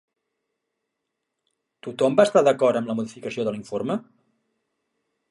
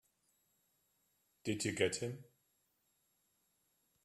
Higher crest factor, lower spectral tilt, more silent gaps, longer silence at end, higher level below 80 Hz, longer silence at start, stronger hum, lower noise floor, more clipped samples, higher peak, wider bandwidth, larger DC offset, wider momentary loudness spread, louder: second, 22 dB vs 28 dB; first, -5.5 dB/octave vs -4 dB/octave; neither; second, 1.3 s vs 1.8 s; first, -72 dBFS vs -78 dBFS; first, 1.85 s vs 1.45 s; neither; about the same, -81 dBFS vs -80 dBFS; neither; first, -2 dBFS vs -18 dBFS; second, 11.5 kHz vs 14 kHz; neither; first, 14 LU vs 11 LU; first, -22 LUFS vs -39 LUFS